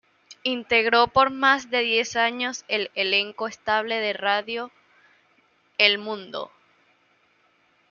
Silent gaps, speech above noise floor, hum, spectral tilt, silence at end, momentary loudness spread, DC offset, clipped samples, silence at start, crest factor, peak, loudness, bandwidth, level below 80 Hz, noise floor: none; 40 dB; none; -2 dB/octave; 1.45 s; 13 LU; under 0.1%; under 0.1%; 0.3 s; 24 dB; -2 dBFS; -22 LUFS; 7.2 kHz; -64 dBFS; -64 dBFS